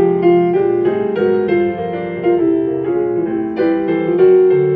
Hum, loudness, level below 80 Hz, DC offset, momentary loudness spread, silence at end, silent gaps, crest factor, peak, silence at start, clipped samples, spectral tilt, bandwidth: none; -15 LUFS; -54 dBFS; under 0.1%; 8 LU; 0 s; none; 12 dB; -2 dBFS; 0 s; under 0.1%; -11 dB/octave; 4.5 kHz